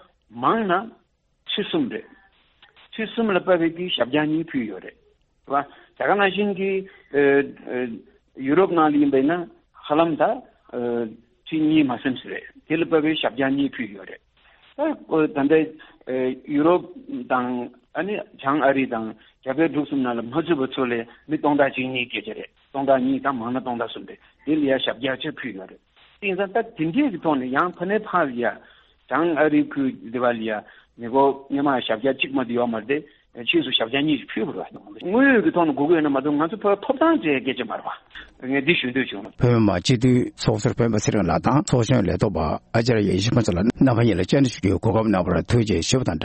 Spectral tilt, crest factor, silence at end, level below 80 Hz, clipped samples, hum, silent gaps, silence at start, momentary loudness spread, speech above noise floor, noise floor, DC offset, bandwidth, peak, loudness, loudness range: -6 dB/octave; 18 dB; 0 s; -52 dBFS; under 0.1%; none; none; 0.3 s; 13 LU; 35 dB; -57 dBFS; under 0.1%; 8.4 kHz; -4 dBFS; -22 LUFS; 4 LU